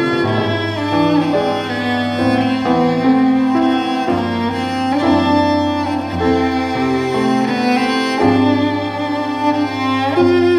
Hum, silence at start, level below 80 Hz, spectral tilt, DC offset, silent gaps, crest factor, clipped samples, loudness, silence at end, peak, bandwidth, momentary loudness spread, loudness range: none; 0 s; -50 dBFS; -6.5 dB/octave; under 0.1%; none; 14 dB; under 0.1%; -16 LUFS; 0 s; -2 dBFS; 10 kHz; 5 LU; 1 LU